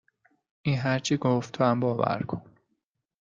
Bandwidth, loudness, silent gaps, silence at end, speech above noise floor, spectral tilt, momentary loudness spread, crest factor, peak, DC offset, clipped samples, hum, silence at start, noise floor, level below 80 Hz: 7.8 kHz; -27 LUFS; none; 0.8 s; 53 dB; -6 dB/octave; 9 LU; 18 dB; -10 dBFS; under 0.1%; under 0.1%; none; 0.65 s; -79 dBFS; -64 dBFS